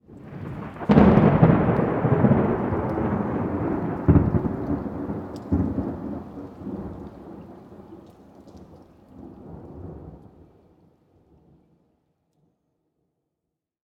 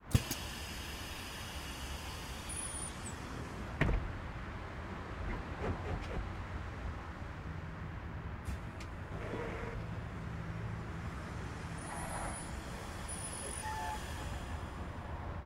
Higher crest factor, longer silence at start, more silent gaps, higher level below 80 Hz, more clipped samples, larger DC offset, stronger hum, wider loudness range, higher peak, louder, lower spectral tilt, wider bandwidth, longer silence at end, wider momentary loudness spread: about the same, 24 dB vs 28 dB; about the same, 0.1 s vs 0 s; neither; first, -40 dBFS vs -46 dBFS; neither; neither; neither; first, 25 LU vs 3 LU; first, 0 dBFS vs -14 dBFS; first, -22 LUFS vs -42 LUFS; first, -10.5 dB/octave vs -4.5 dB/octave; second, 5.4 kHz vs 16 kHz; first, 3.7 s vs 0 s; first, 25 LU vs 5 LU